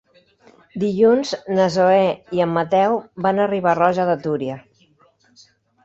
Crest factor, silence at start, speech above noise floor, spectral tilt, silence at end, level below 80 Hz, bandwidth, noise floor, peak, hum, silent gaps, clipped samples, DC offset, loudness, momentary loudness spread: 16 dB; 0.75 s; 40 dB; -6.5 dB/octave; 1.25 s; -60 dBFS; 8 kHz; -57 dBFS; -2 dBFS; none; none; under 0.1%; under 0.1%; -18 LUFS; 9 LU